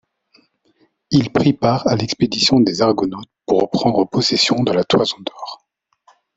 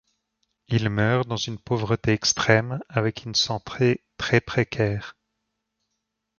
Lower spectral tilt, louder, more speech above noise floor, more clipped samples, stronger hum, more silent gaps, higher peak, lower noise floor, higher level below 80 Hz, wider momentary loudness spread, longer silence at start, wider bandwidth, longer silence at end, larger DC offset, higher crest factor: about the same, -5 dB/octave vs -4.5 dB/octave; first, -16 LUFS vs -24 LUFS; second, 44 dB vs 56 dB; neither; neither; neither; about the same, 0 dBFS vs -2 dBFS; second, -60 dBFS vs -80 dBFS; about the same, -50 dBFS vs -52 dBFS; first, 11 LU vs 7 LU; first, 1.1 s vs 0.7 s; first, 8.2 kHz vs 7.2 kHz; second, 0.8 s vs 1.3 s; neither; second, 18 dB vs 24 dB